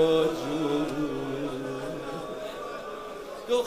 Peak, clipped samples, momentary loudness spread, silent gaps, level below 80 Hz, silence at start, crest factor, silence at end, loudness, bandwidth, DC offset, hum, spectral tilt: -12 dBFS; under 0.1%; 11 LU; none; -54 dBFS; 0 s; 16 dB; 0 s; -31 LUFS; 15.5 kHz; under 0.1%; none; -5.5 dB/octave